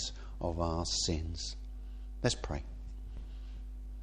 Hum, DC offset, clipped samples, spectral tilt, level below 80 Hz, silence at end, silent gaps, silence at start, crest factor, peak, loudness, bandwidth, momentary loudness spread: none; under 0.1%; under 0.1%; -4 dB/octave; -42 dBFS; 0 s; none; 0 s; 22 dB; -16 dBFS; -38 LUFS; 10 kHz; 15 LU